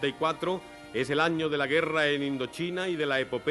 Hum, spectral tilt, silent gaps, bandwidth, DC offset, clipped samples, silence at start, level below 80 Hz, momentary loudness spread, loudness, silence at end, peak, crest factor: none; -5 dB/octave; none; 12.5 kHz; under 0.1%; under 0.1%; 0 s; -64 dBFS; 7 LU; -28 LUFS; 0 s; -12 dBFS; 16 dB